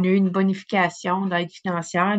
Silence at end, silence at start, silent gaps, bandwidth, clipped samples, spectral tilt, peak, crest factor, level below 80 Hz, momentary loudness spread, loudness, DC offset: 0 s; 0 s; none; 8.2 kHz; under 0.1%; -6 dB/octave; -6 dBFS; 16 dB; -70 dBFS; 6 LU; -23 LUFS; under 0.1%